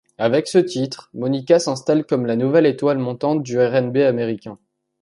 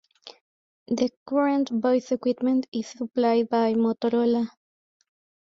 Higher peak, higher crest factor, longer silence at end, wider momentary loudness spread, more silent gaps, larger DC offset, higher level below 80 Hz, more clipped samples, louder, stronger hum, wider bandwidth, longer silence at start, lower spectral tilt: first, -2 dBFS vs -12 dBFS; about the same, 16 dB vs 14 dB; second, 0.5 s vs 1.1 s; about the same, 9 LU vs 8 LU; second, none vs 0.41-0.86 s, 1.17-1.26 s, 2.68-2.72 s; neither; first, -64 dBFS vs -70 dBFS; neither; first, -19 LUFS vs -25 LUFS; neither; first, 11.5 kHz vs 7.6 kHz; about the same, 0.2 s vs 0.25 s; about the same, -6 dB/octave vs -6 dB/octave